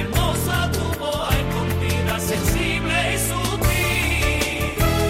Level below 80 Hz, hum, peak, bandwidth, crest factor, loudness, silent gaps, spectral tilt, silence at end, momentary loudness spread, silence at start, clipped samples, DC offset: -28 dBFS; none; -6 dBFS; 16.5 kHz; 14 dB; -21 LUFS; none; -4.5 dB/octave; 0 s; 3 LU; 0 s; under 0.1%; under 0.1%